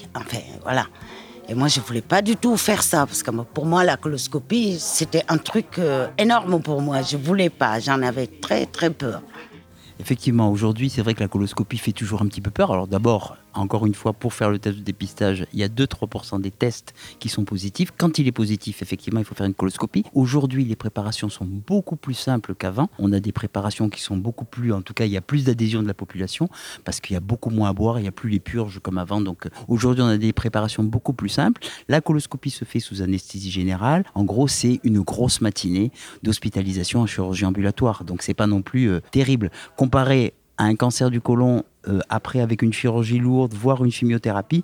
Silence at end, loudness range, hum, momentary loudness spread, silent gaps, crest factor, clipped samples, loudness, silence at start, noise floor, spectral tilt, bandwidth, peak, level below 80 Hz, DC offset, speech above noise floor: 0 s; 4 LU; none; 9 LU; none; 20 dB; under 0.1%; -22 LUFS; 0 s; -46 dBFS; -5.5 dB/octave; 20 kHz; -2 dBFS; -48 dBFS; under 0.1%; 24 dB